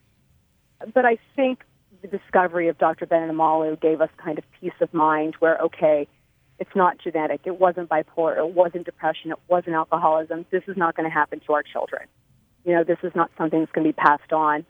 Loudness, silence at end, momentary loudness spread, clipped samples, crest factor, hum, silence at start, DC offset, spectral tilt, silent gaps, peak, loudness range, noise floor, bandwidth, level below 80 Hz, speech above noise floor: -22 LUFS; 0.1 s; 11 LU; under 0.1%; 22 dB; none; 0.8 s; under 0.1%; -8.5 dB/octave; none; 0 dBFS; 2 LU; -62 dBFS; 4.7 kHz; -68 dBFS; 40 dB